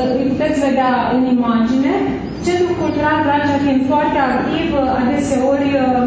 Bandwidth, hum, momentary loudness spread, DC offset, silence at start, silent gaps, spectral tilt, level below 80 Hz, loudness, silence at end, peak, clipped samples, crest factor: 8 kHz; none; 3 LU; under 0.1%; 0 s; none; -6 dB/octave; -38 dBFS; -16 LUFS; 0 s; -4 dBFS; under 0.1%; 12 dB